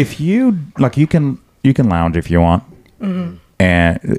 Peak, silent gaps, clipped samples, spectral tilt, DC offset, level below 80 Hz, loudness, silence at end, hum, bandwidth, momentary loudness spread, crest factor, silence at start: 0 dBFS; none; under 0.1%; -8 dB/octave; under 0.1%; -32 dBFS; -15 LUFS; 0 s; none; 12.5 kHz; 9 LU; 14 dB; 0 s